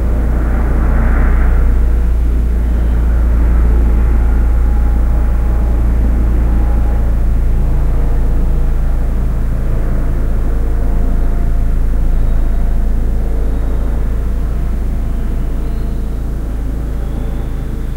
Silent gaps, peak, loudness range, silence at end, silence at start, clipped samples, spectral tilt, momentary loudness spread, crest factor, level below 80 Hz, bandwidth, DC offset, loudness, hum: none; 0 dBFS; 5 LU; 0 s; 0 s; under 0.1%; -8.5 dB/octave; 7 LU; 10 dB; -12 dBFS; 3.7 kHz; under 0.1%; -17 LUFS; none